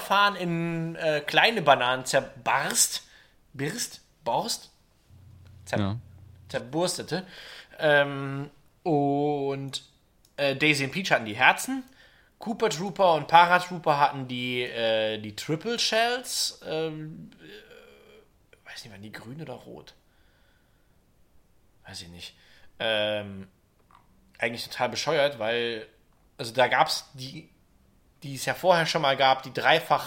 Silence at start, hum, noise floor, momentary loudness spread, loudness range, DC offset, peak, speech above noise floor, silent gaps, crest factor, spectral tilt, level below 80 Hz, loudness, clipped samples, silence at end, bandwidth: 0 s; none; -63 dBFS; 21 LU; 20 LU; under 0.1%; -2 dBFS; 37 dB; none; 26 dB; -3 dB/octave; -64 dBFS; -25 LUFS; under 0.1%; 0 s; 16.5 kHz